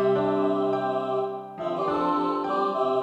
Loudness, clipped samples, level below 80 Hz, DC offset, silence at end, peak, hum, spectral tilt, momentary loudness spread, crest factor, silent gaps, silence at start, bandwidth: -26 LUFS; under 0.1%; -64 dBFS; under 0.1%; 0 s; -12 dBFS; none; -7.5 dB/octave; 6 LU; 12 dB; none; 0 s; 8 kHz